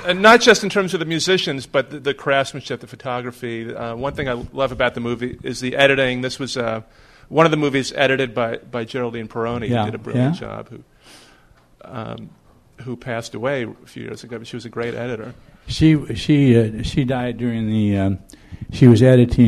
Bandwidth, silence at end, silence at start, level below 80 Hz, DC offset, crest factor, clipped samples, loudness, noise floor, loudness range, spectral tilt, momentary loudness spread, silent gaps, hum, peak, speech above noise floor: 13.5 kHz; 0 s; 0 s; -42 dBFS; under 0.1%; 20 dB; under 0.1%; -19 LUFS; -52 dBFS; 11 LU; -5.5 dB/octave; 18 LU; none; none; 0 dBFS; 33 dB